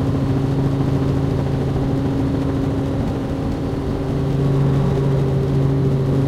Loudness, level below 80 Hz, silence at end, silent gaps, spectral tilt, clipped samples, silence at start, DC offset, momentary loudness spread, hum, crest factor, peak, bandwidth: -19 LUFS; -30 dBFS; 0 s; none; -9 dB/octave; under 0.1%; 0 s; under 0.1%; 5 LU; none; 12 dB; -6 dBFS; 8.4 kHz